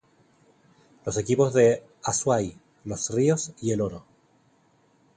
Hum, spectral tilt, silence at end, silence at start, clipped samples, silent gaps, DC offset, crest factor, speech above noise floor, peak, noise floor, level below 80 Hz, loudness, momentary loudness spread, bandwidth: none; -5 dB/octave; 1.15 s; 1.05 s; under 0.1%; none; under 0.1%; 18 dB; 39 dB; -8 dBFS; -63 dBFS; -56 dBFS; -25 LUFS; 16 LU; 9.8 kHz